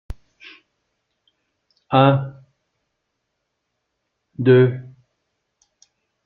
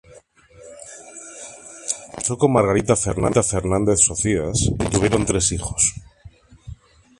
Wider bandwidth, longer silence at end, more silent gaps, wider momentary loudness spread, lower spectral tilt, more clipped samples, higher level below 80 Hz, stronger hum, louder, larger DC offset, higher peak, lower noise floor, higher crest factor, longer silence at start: second, 5.6 kHz vs 11.5 kHz; first, 1.45 s vs 0.45 s; neither; first, 26 LU vs 21 LU; first, -9 dB/octave vs -4.5 dB/octave; neither; second, -50 dBFS vs -38 dBFS; neither; about the same, -17 LUFS vs -19 LUFS; neither; about the same, 0 dBFS vs -2 dBFS; first, -76 dBFS vs -49 dBFS; about the same, 22 dB vs 20 dB; about the same, 0.1 s vs 0.1 s